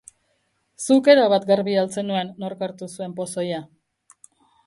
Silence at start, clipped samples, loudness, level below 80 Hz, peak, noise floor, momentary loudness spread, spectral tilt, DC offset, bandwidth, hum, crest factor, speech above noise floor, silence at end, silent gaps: 0.8 s; under 0.1%; -21 LUFS; -72 dBFS; 0 dBFS; -69 dBFS; 17 LU; -5 dB/octave; under 0.1%; 11.5 kHz; none; 22 dB; 49 dB; 1 s; none